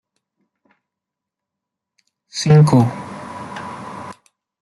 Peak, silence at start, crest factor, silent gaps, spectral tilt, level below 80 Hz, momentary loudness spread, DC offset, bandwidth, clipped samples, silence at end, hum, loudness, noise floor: -2 dBFS; 2.35 s; 18 dB; none; -7 dB/octave; -56 dBFS; 21 LU; under 0.1%; 11.5 kHz; under 0.1%; 0.5 s; none; -14 LUFS; -84 dBFS